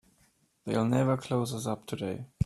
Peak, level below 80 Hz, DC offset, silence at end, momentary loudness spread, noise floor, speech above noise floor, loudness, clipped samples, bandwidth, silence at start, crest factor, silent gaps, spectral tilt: -14 dBFS; -60 dBFS; under 0.1%; 0 s; 10 LU; -68 dBFS; 39 dB; -31 LUFS; under 0.1%; 13.5 kHz; 0.65 s; 18 dB; none; -6.5 dB/octave